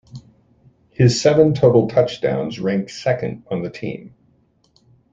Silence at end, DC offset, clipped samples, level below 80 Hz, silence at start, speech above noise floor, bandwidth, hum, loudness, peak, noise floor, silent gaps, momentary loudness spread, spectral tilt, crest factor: 1.05 s; under 0.1%; under 0.1%; -54 dBFS; 0.15 s; 42 dB; 8 kHz; none; -18 LUFS; -2 dBFS; -59 dBFS; none; 15 LU; -6.5 dB/octave; 18 dB